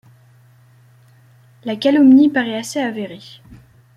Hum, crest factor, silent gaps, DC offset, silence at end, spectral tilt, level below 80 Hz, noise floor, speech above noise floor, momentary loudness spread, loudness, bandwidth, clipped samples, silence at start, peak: none; 16 dB; none; under 0.1%; 0.4 s; -5 dB/octave; -60 dBFS; -49 dBFS; 35 dB; 21 LU; -15 LUFS; 12.5 kHz; under 0.1%; 1.65 s; -2 dBFS